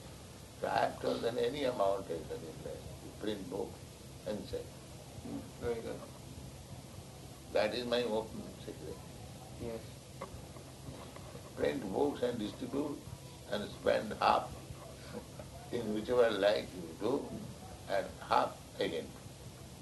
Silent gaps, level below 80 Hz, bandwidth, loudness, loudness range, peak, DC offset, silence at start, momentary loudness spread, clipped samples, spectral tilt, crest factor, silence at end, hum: none; -58 dBFS; 12 kHz; -37 LUFS; 9 LU; -14 dBFS; under 0.1%; 0 s; 17 LU; under 0.1%; -5 dB/octave; 24 dB; 0 s; none